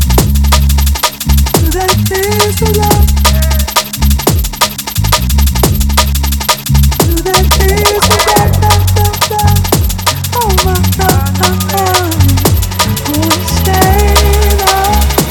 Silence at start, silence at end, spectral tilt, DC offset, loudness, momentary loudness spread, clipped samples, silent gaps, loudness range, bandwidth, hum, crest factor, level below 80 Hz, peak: 0 s; 0 s; -4 dB/octave; under 0.1%; -10 LUFS; 4 LU; 0.5%; none; 2 LU; over 20 kHz; none; 10 dB; -14 dBFS; 0 dBFS